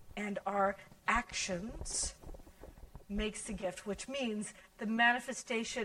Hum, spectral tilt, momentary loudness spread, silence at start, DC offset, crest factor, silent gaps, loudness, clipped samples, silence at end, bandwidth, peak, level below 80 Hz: none; -3 dB/octave; 16 LU; 0 s; under 0.1%; 22 dB; none; -36 LUFS; under 0.1%; 0 s; 16 kHz; -14 dBFS; -52 dBFS